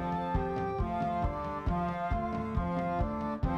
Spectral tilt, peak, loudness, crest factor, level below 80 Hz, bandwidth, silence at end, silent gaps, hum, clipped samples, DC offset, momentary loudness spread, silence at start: -9 dB/octave; -18 dBFS; -33 LUFS; 14 dB; -40 dBFS; 8.2 kHz; 0 s; none; none; under 0.1%; under 0.1%; 2 LU; 0 s